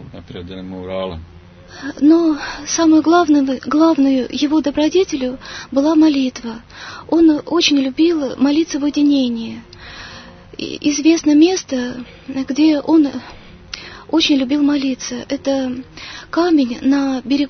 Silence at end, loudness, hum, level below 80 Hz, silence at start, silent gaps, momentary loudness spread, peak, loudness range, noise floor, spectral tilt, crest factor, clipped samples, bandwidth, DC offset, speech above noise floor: 0 s; -15 LUFS; 50 Hz at -50 dBFS; -48 dBFS; 0 s; none; 19 LU; 0 dBFS; 3 LU; -37 dBFS; -4 dB/octave; 16 dB; under 0.1%; 6.6 kHz; under 0.1%; 22 dB